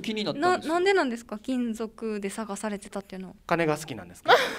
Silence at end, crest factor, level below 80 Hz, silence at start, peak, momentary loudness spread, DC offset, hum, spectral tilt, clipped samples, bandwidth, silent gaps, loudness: 0 s; 22 dB; -60 dBFS; 0 s; -4 dBFS; 14 LU; under 0.1%; none; -4.5 dB/octave; under 0.1%; 16 kHz; none; -27 LUFS